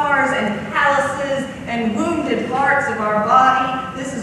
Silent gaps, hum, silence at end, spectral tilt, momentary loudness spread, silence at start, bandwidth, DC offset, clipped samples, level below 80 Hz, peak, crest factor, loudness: none; none; 0 s; -5 dB/octave; 10 LU; 0 s; 12.5 kHz; under 0.1%; under 0.1%; -50 dBFS; 0 dBFS; 16 dB; -18 LUFS